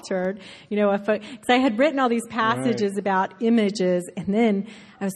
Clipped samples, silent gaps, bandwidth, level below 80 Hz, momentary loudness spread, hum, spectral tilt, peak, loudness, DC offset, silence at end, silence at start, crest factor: under 0.1%; none; 12.5 kHz; -64 dBFS; 8 LU; none; -5.5 dB/octave; -8 dBFS; -23 LUFS; under 0.1%; 0 s; 0.05 s; 16 dB